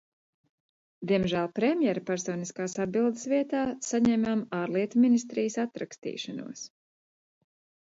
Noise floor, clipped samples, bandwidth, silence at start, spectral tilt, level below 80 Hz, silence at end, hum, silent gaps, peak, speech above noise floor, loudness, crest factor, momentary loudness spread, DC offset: under -90 dBFS; under 0.1%; 8 kHz; 1 s; -5.5 dB/octave; -66 dBFS; 1.15 s; none; 5.98-6.02 s; -14 dBFS; over 62 dB; -28 LUFS; 16 dB; 13 LU; under 0.1%